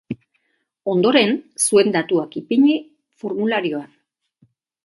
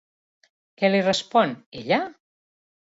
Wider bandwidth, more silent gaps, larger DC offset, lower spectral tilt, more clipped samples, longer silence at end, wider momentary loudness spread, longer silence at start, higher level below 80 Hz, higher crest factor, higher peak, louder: first, 12 kHz vs 8 kHz; second, none vs 1.66-1.72 s; neither; about the same, -4 dB/octave vs -5 dB/octave; neither; first, 1 s vs 0.75 s; first, 15 LU vs 10 LU; second, 0.1 s vs 0.8 s; about the same, -66 dBFS vs -68 dBFS; about the same, 20 dB vs 20 dB; first, 0 dBFS vs -6 dBFS; first, -18 LUFS vs -22 LUFS